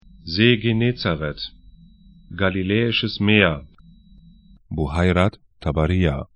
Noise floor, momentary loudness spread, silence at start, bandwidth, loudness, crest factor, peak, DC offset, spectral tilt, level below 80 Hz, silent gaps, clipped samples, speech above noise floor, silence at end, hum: -49 dBFS; 15 LU; 0.25 s; 10 kHz; -20 LUFS; 22 dB; 0 dBFS; under 0.1%; -7.5 dB/octave; -38 dBFS; none; under 0.1%; 30 dB; 0.1 s; none